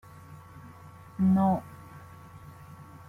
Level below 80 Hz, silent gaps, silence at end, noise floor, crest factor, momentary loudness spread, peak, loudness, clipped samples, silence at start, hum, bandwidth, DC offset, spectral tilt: -62 dBFS; none; 0.25 s; -49 dBFS; 16 dB; 25 LU; -14 dBFS; -26 LUFS; under 0.1%; 0.3 s; none; 3.7 kHz; under 0.1%; -9.5 dB/octave